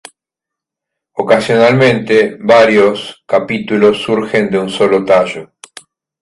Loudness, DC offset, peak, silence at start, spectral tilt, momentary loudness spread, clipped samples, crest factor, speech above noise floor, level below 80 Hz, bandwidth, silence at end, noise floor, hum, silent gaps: -11 LUFS; under 0.1%; 0 dBFS; 1.15 s; -5.5 dB/octave; 10 LU; under 0.1%; 12 dB; 72 dB; -52 dBFS; 11.5 kHz; 0.75 s; -83 dBFS; none; none